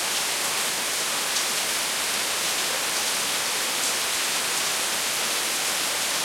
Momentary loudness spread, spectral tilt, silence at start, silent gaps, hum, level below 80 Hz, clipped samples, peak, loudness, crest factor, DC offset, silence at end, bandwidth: 1 LU; 1 dB/octave; 0 s; none; none; -66 dBFS; under 0.1%; -6 dBFS; -23 LUFS; 20 dB; under 0.1%; 0 s; 16.5 kHz